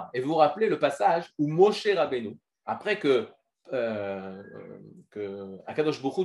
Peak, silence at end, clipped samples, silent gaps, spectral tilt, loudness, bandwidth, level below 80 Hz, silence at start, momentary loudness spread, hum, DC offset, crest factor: -6 dBFS; 0 s; under 0.1%; none; -6 dB/octave; -27 LUFS; 11.5 kHz; -78 dBFS; 0 s; 20 LU; none; under 0.1%; 20 dB